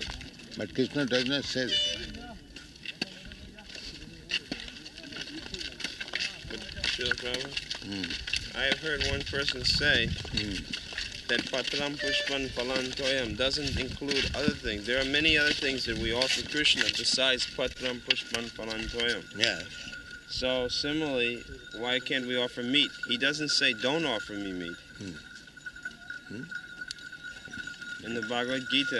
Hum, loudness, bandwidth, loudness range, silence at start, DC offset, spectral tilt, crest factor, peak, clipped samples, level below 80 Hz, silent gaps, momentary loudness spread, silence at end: none; -29 LUFS; 12 kHz; 11 LU; 0 s; under 0.1%; -3 dB/octave; 26 dB; -6 dBFS; under 0.1%; -50 dBFS; none; 17 LU; 0 s